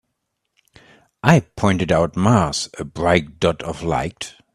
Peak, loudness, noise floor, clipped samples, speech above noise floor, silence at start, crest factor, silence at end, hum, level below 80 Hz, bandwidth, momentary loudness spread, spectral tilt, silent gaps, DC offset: 0 dBFS; -19 LUFS; -75 dBFS; under 0.1%; 57 dB; 1.25 s; 20 dB; 0.25 s; none; -44 dBFS; 13 kHz; 10 LU; -5.5 dB/octave; none; under 0.1%